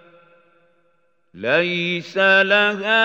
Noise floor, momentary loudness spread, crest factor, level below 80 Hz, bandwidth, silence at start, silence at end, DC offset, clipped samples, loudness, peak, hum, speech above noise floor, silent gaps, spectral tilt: -65 dBFS; 9 LU; 18 dB; -78 dBFS; 8 kHz; 1.35 s; 0 s; under 0.1%; under 0.1%; -17 LUFS; -2 dBFS; none; 48 dB; none; -5 dB/octave